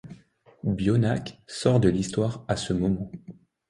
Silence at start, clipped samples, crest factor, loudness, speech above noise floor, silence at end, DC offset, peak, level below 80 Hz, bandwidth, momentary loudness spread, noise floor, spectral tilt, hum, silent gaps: 0.05 s; under 0.1%; 18 dB; -26 LUFS; 30 dB; 0.35 s; under 0.1%; -8 dBFS; -48 dBFS; 11 kHz; 12 LU; -55 dBFS; -6.5 dB/octave; none; none